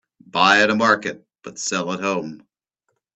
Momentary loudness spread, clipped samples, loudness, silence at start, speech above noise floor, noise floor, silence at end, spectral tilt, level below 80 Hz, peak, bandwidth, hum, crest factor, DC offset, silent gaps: 20 LU; under 0.1%; -19 LUFS; 0.35 s; 55 dB; -75 dBFS; 0.8 s; -3 dB/octave; -64 dBFS; 0 dBFS; 9.2 kHz; none; 22 dB; under 0.1%; none